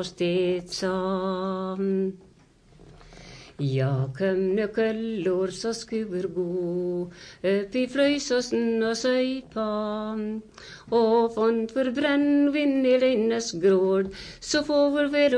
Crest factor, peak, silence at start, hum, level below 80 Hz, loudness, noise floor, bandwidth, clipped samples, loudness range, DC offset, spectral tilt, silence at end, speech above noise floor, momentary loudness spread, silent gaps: 14 dB; -10 dBFS; 0 s; none; -58 dBFS; -25 LUFS; -56 dBFS; 10.5 kHz; under 0.1%; 6 LU; under 0.1%; -5.5 dB/octave; 0 s; 31 dB; 9 LU; none